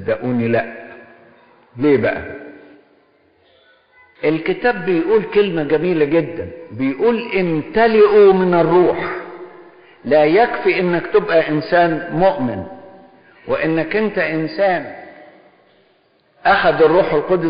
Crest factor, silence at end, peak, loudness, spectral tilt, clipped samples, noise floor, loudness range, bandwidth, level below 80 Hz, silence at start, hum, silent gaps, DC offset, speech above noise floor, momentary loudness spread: 14 dB; 0 s; -2 dBFS; -16 LUFS; -5 dB/octave; under 0.1%; -57 dBFS; 7 LU; 5.2 kHz; -48 dBFS; 0 s; none; none; under 0.1%; 42 dB; 16 LU